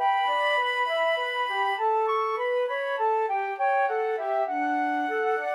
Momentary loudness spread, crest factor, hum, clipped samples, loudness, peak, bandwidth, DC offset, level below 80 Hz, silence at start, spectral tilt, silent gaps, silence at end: 3 LU; 12 dB; none; under 0.1%; -26 LUFS; -14 dBFS; 12.5 kHz; under 0.1%; under -90 dBFS; 0 s; -1 dB/octave; none; 0 s